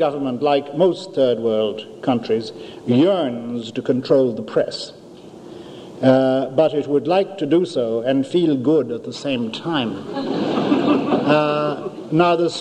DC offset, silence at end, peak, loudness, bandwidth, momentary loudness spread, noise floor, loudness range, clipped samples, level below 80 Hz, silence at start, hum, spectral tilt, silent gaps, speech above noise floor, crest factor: under 0.1%; 0 s; -2 dBFS; -19 LUFS; 9.6 kHz; 10 LU; -40 dBFS; 2 LU; under 0.1%; -64 dBFS; 0 s; none; -6.5 dB/octave; none; 21 dB; 18 dB